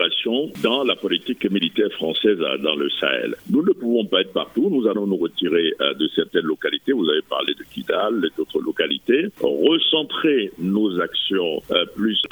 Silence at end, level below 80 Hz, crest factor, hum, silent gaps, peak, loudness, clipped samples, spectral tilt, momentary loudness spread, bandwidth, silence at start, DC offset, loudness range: 0.05 s; -64 dBFS; 18 dB; none; none; -2 dBFS; -21 LUFS; under 0.1%; -6 dB/octave; 4 LU; over 20 kHz; 0 s; under 0.1%; 2 LU